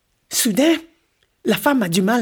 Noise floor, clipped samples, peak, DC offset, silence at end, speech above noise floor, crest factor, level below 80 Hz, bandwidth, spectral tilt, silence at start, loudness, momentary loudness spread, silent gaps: -64 dBFS; under 0.1%; -4 dBFS; under 0.1%; 0 s; 47 dB; 16 dB; -60 dBFS; over 20 kHz; -4 dB/octave; 0.3 s; -18 LUFS; 7 LU; none